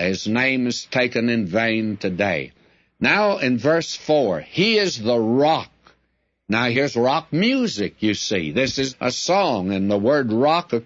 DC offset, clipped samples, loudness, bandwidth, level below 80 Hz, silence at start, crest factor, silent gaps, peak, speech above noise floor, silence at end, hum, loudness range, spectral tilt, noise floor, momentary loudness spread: under 0.1%; under 0.1%; -20 LUFS; 8 kHz; -58 dBFS; 0 s; 16 dB; none; -4 dBFS; 49 dB; 0.05 s; none; 2 LU; -4.5 dB/octave; -69 dBFS; 5 LU